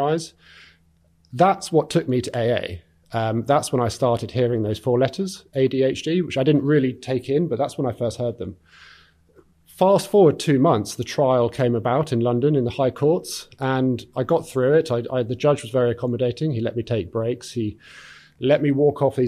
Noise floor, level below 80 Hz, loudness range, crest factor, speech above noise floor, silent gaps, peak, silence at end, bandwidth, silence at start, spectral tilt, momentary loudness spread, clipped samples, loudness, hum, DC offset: -59 dBFS; -56 dBFS; 4 LU; 16 dB; 39 dB; none; -4 dBFS; 0 s; 15 kHz; 0 s; -6.5 dB/octave; 9 LU; under 0.1%; -21 LUFS; none; under 0.1%